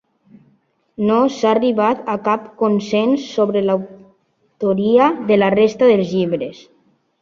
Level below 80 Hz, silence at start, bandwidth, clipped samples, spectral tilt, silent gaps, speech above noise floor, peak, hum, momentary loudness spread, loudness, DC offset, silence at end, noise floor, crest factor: -60 dBFS; 1 s; 7.4 kHz; under 0.1%; -6.5 dB/octave; none; 45 dB; -2 dBFS; none; 8 LU; -16 LUFS; under 0.1%; 0.7 s; -60 dBFS; 16 dB